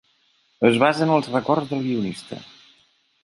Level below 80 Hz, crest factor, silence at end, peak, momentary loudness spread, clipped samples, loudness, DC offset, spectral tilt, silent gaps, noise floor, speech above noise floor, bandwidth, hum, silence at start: -64 dBFS; 20 dB; 0.8 s; -2 dBFS; 18 LU; under 0.1%; -21 LUFS; under 0.1%; -6.5 dB/octave; none; -63 dBFS; 43 dB; 11.5 kHz; none; 0.6 s